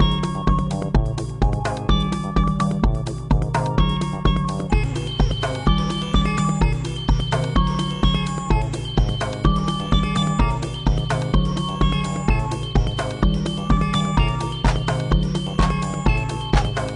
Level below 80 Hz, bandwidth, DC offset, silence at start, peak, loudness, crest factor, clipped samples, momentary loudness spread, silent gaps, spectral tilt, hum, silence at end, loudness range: -24 dBFS; 10.5 kHz; under 0.1%; 0 s; -4 dBFS; -22 LUFS; 16 dB; under 0.1%; 3 LU; none; -6 dB/octave; none; 0 s; 1 LU